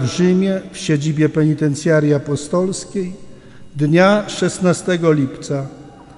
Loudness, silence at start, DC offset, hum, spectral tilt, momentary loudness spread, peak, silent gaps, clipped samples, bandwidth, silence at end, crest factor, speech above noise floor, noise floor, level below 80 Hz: -17 LUFS; 0 s; under 0.1%; none; -6 dB/octave; 11 LU; 0 dBFS; none; under 0.1%; 11 kHz; 0.05 s; 16 dB; 20 dB; -36 dBFS; -50 dBFS